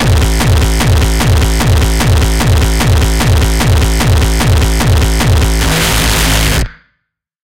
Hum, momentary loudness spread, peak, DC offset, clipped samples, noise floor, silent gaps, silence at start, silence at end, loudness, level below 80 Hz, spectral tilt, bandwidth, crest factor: none; 1 LU; 0 dBFS; 2%; under 0.1%; -68 dBFS; none; 0 s; 0.65 s; -11 LUFS; -14 dBFS; -4.5 dB/octave; 17 kHz; 8 dB